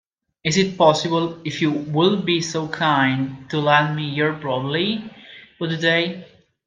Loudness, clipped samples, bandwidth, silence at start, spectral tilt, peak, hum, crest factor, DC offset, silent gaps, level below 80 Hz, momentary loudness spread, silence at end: -20 LUFS; under 0.1%; 9.6 kHz; 0.45 s; -5 dB/octave; 0 dBFS; none; 20 dB; under 0.1%; none; -60 dBFS; 10 LU; 0.4 s